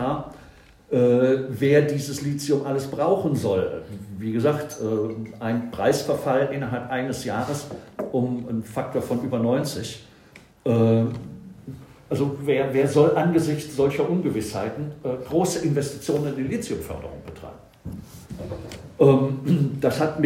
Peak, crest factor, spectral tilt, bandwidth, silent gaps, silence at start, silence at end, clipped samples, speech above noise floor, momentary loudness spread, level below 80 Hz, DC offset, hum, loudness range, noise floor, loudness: -4 dBFS; 20 dB; -6.5 dB/octave; 16 kHz; none; 0 s; 0 s; under 0.1%; 27 dB; 19 LU; -54 dBFS; under 0.1%; none; 5 LU; -50 dBFS; -23 LUFS